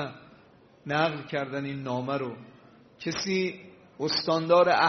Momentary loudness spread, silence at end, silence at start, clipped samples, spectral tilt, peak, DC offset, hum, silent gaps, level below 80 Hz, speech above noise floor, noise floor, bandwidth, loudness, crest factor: 15 LU; 0 s; 0 s; under 0.1%; -3 dB/octave; -10 dBFS; under 0.1%; none; none; -68 dBFS; 30 dB; -57 dBFS; 6.4 kHz; -28 LUFS; 18 dB